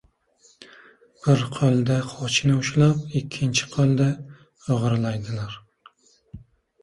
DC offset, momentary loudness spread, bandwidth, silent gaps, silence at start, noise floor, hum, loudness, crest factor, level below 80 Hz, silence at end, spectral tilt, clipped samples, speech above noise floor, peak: under 0.1%; 12 LU; 11.5 kHz; none; 0.6 s; -60 dBFS; none; -22 LUFS; 16 dB; -54 dBFS; 0.45 s; -5.5 dB/octave; under 0.1%; 38 dB; -8 dBFS